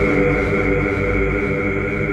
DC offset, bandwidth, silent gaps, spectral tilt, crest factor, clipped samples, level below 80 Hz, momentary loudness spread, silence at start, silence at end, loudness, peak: under 0.1%; 9.4 kHz; none; -8 dB/octave; 14 dB; under 0.1%; -28 dBFS; 3 LU; 0 s; 0 s; -18 LUFS; -4 dBFS